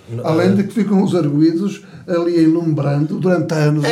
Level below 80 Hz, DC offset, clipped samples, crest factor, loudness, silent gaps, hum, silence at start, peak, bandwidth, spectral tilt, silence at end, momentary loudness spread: -60 dBFS; under 0.1%; under 0.1%; 12 dB; -16 LUFS; none; none; 0.1 s; -2 dBFS; 12.5 kHz; -7.5 dB/octave; 0 s; 6 LU